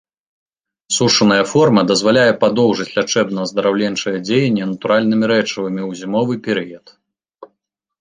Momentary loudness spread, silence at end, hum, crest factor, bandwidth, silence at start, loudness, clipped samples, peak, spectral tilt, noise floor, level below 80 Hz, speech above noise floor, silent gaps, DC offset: 9 LU; 0.55 s; none; 16 dB; 10 kHz; 0.9 s; -15 LUFS; under 0.1%; 0 dBFS; -4.5 dB/octave; -74 dBFS; -58 dBFS; 58 dB; none; under 0.1%